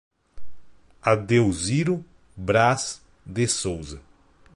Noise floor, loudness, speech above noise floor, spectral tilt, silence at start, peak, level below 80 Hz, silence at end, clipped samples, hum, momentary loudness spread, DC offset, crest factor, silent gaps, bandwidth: -44 dBFS; -23 LUFS; 21 dB; -5 dB/octave; 0.35 s; -4 dBFS; -48 dBFS; 0.1 s; under 0.1%; none; 15 LU; under 0.1%; 20 dB; none; 11.5 kHz